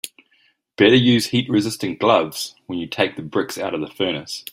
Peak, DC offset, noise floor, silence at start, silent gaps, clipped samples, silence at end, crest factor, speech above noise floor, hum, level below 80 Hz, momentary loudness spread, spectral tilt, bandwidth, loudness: -2 dBFS; under 0.1%; -61 dBFS; 0.05 s; none; under 0.1%; 0.1 s; 18 dB; 42 dB; none; -60 dBFS; 13 LU; -5 dB/octave; 16 kHz; -19 LUFS